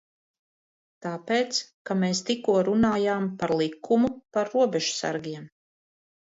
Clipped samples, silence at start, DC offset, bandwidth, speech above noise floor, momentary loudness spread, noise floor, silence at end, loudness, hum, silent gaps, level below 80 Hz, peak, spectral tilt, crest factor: under 0.1%; 1.05 s; under 0.1%; 8 kHz; over 65 dB; 11 LU; under -90 dBFS; 0.8 s; -26 LUFS; none; 1.74-1.85 s; -62 dBFS; -10 dBFS; -4.5 dB/octave; 16 dB